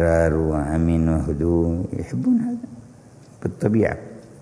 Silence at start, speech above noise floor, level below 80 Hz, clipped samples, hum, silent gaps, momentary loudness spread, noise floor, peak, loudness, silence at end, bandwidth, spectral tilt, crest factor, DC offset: 0 s; 26 dB; -34 dBFS; under 0.1%; none; none; 12 LU; -46 dBFS; -4 dBFS; -22 LUFS; 0 s; 11 kHz; -9 dB/octave; 18 dB; under 0.1%